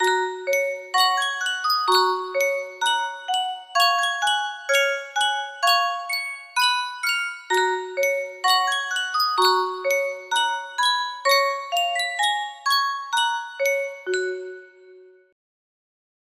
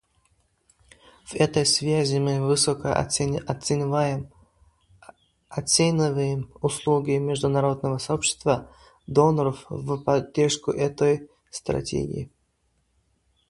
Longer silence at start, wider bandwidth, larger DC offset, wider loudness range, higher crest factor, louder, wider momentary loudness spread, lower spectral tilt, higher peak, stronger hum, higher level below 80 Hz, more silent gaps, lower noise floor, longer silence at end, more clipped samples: second, 0 s vs 1.3 s; first, 16 kHz vs 11.5 kHz; neither; about the same, 3 LU vs 3 LU; about the same, 18 dB vs 22 dB; about the same, -22 LUFS vs -24 LUFS; second, 6 LU vs 11 LU; second, 1 dB/octave vs -4.5 dB/octave; about the same, -6 dBFS vs -4 dBFS; neither; second, -76 dBFS vs -52 dBFS; neither; second, -49 dBFS vs -70 dBFS; about the same, 1.3 s vs 1.25 s; neither